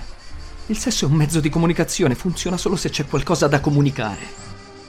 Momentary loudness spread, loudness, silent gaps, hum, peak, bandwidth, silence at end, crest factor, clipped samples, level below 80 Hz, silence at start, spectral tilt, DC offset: 20 LU; -20 LUFS; none; none; -2 dBFS; 15.5 kHz; 0 s; 18 dB; under 0.1%; -36 dBFS; 0 s; -5 dB/octave; under 0.1%